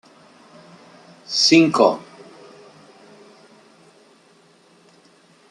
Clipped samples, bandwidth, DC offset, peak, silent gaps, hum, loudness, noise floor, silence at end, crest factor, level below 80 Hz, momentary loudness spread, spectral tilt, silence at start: under 0.1%; 11 kHz; under 0.1%; -2 dBFS; none; none; -16 LUFS; -54 dBFS; 3.5 s; 22 dB; -70 dBFS; 12 LU; -3.5 dB/octave; 1.3 s